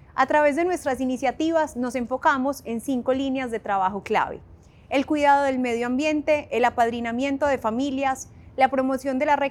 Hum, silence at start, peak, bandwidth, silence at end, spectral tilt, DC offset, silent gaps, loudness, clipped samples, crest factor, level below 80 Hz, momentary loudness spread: none; 0.15 s; -6 dBFS; 15 kHz; 0 s; -4.5 dB/octave; under 0.1%; none; -23 LUFS; under 0.1%; 16 dB; -54 dBFS; 7 LU